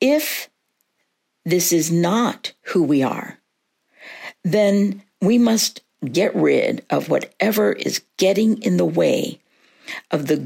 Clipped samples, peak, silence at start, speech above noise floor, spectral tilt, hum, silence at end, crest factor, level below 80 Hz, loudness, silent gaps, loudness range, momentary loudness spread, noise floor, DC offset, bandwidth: under 0.1%; -4 dBFS; 0 s; 53 dB; -4.5 dB/octave; none; 0 s; 16 dB; -70 dBFS; -19 LUFS; none; 2 LU; 14 LU; -72 dBFS; under 0.1%; 16.5 kHz